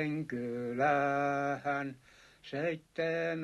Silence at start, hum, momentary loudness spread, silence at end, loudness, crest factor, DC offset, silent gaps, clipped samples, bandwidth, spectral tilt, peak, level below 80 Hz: 0 s; none; 9 LU; 0 s; -34 LUFS; 16 dB; under 0.1%; none; under 0.1%; 12 kHz; -6.5 dB/octave; -18 dBFS; -72 dBFS